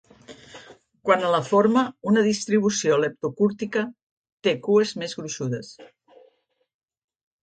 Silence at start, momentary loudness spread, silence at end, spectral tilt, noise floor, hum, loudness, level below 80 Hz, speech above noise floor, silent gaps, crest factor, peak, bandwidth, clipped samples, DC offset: 0.3 s; 12 LU; 1.6 s; -5 dB/octave; -66 dBFS; none; -23 LUFS; -68 dBFS; 44 dB; 4.03-4.22 s, 4.32-4.38 s; 20 dB; -4 dBFS; 9.2 kHz; under 0.1%; under 0.1%